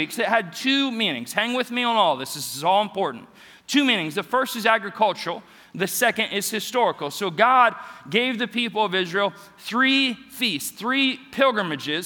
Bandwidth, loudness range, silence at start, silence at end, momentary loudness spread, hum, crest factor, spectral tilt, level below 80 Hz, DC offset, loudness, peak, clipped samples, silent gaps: 19.5 kHz; 2 LU; 0 s; 0 s; 9 LU; none; 20 dB; -3 dB/octave; -72 dBFS; under 0.1%; -22 LUFS; -2 dBFS; under 0.1%; none